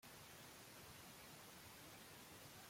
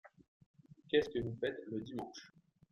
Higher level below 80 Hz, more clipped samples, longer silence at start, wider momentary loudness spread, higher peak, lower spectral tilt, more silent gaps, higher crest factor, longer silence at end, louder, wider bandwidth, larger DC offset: second, -80 dBFS vs -68 dBFS; neither; about the same, 0 s vs 0.05 s; second, 0 LU vs 14 LU; second, -46 dBFS vs -20 dBFS; second, -2.5 dB/octave vs -6 dB/octave; second, none vs 0.28-0.40 s, 0.46-0.54 s; second, 14 dB vs 22 dB; second, 0 s vs 0.45 s; second, -59 LUFS vs -39 LUFS; first, 16.5 kHz vs 7.2 kHz; neither